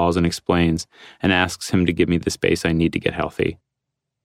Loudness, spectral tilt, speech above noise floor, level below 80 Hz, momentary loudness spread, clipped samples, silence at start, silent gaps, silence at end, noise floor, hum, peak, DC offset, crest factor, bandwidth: -20 LUFS; -5.5 dB/octave; 61 dB; -42 dBFS; 6 LU; under 0.1%; 0 s; none; 0.7 s; -81 dBFS; none; -4 dBFS; under 0.1%; 16 dB; 15 kHz